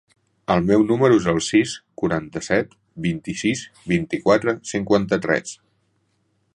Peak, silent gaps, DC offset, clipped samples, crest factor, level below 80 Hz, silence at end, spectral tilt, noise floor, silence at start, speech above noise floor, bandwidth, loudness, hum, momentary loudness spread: -2 dBFS; none; under 0.1%; under 0.1%; 18 dB; -50 dBFS; 1 s; -5.5 dB/octave; -67 dBFS; 0.5 s; 47 dB; 11 kHz; -21 LUFS; none; 11 LU